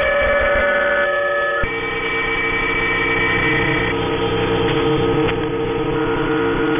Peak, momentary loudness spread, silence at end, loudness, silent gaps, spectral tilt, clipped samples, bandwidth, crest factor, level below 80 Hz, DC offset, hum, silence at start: -6 dBFS; 4 LU; 0 s; -17 LUFS; none; -9 dB/octave; under 0.1%; 3.7 kHz; 12 dB; -34 dBFS; under 0.1%; none; 0 s